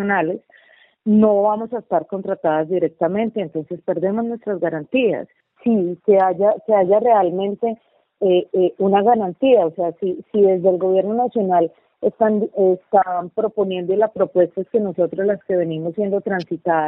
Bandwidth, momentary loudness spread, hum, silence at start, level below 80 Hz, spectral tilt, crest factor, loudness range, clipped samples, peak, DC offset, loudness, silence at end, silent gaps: 5.6 kHz; 9 LU; none; 0 s; -64 dBFS; -10 dB/octave; 16 dB; 4 LU; under 0.1%; -2 dBFS; under 0.1%; -19 LUFS; 0 s; none